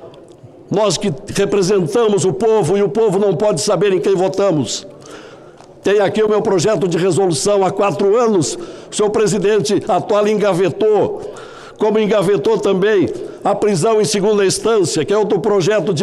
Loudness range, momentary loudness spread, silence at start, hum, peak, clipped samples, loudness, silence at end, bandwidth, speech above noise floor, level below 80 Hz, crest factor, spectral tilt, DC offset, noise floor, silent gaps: 2 LU; 7 LU; 0 s; none; -4 dBFS; under 0.1%; -15 LUFS; 0 s; 12.5 kHz; 25 dB; -50 dBFS; 12 dB; -5 dB/octave; under 0.1%; -39 dBFS; none